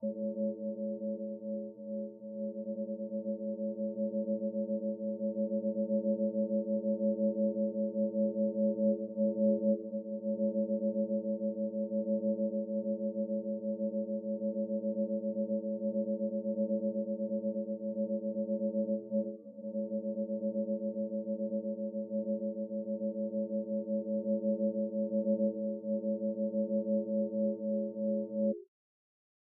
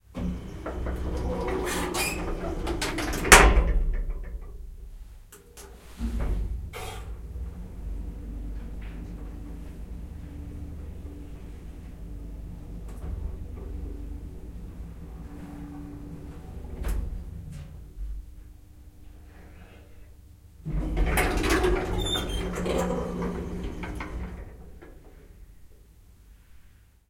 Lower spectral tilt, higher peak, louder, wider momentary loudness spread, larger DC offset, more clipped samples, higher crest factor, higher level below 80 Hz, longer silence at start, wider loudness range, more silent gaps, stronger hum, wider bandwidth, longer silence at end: first, -9.5 dB/octave vs -3.5 dB/octave; second, -20 dBFS vs 0 dBFS; second, -35 LUFS vs -28 LUFS; second, 6 LU vs 20 LU; neither; neither; second, 14 dB vs 30 dB; second, under -90 dBFS vs -34 dBFS; about the same, 0 s vs 0.1 s; second, 4 LU vs 19 LU; neither; neither; second, 1 kHz vs 16.5 kHz; first, 0.85 s vs 0.4 s